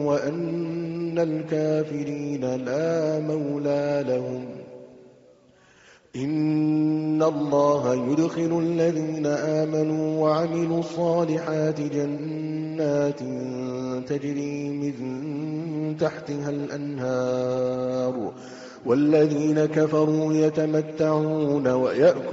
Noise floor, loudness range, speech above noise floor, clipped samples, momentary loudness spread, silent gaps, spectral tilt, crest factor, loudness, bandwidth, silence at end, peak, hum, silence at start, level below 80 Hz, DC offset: -56 dBFS; 6 LU; 32 dB; under 0.1%; 9 LU; none; -7.5 dB/octave; 16 dB; -25 LUFS; 7.6 kHz; 0 s; -8 dBFS; none; 0 s; -66 dBFS; under 0.1%